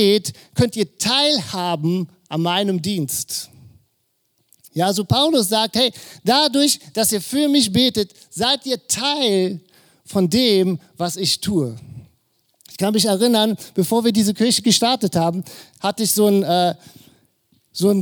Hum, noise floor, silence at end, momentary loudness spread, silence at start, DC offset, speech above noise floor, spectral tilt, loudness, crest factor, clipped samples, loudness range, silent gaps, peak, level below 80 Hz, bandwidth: none; -68 dBFS; 0 s; 10 LU; 0 s; under 0.1%; 50 dB; -4 dB/octave; -18 LUFS; 18 dB; under 0.1%; 4 LU; none; -2 dBFS; -56 dBFS; over 20 kHz